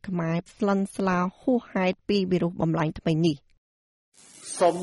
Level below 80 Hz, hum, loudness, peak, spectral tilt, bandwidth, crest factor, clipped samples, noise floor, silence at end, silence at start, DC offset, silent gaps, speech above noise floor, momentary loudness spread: -56 dBFS; none; -26 LUFS; -8 dBFS; -6.5 dB/octave; 11.5 kHz; 18 dB; under 0.1%; under -90 dBFS; 0 s; 0.05 s; under 0.1%; 3.58-4.12 s; over 65 dB; 4 LU